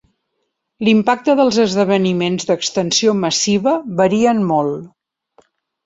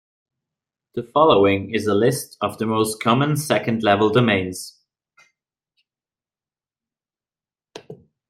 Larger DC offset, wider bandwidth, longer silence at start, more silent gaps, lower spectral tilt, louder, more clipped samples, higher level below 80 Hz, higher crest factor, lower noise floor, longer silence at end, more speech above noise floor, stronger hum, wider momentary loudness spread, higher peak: neither; second, 8 kHz vs 16 kHz; second, 0.8 s vs 0.95 s; neither; about the same, -4.5 dB/octave vs -5.5 dB/octave; first, -15 LUFS vs -19 LUFS; neither; about the same, -56 dBFS vs -60 dBFS; about the same, 16 dB vs 20 dB; second, -72 dBFS vs under -90 dBFS; first, 1 s vs 0.35 s; second, 57 dB vs over 71 dB; neither; second, 5 LU vs 14 LU; about the same, 0 dBFS vs -2 dBFS